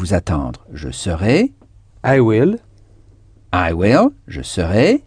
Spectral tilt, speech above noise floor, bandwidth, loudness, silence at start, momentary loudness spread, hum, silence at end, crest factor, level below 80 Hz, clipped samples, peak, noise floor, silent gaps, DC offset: -6.5 dB/octave; 31 dB; 10 kHz; -16 LUFS; 0 s; 14 LU; none; 0.05 s; 16 dB; -34 dBFS; under 0.1%; 0 dBFS; -46 dBFS; none; under 0.1%